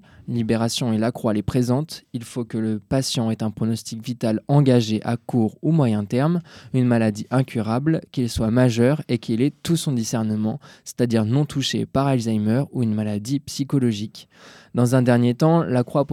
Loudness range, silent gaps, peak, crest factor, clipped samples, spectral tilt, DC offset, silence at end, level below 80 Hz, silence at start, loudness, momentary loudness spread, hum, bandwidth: 3 LU; none; -4 dBFS; 18 dB; under 0.1%; -6.5 dB/octave; under 0.1%; 0 s; -52 dBFS; 0.25 s; -22 LUFS; 9 LU; none; 15.5 kHz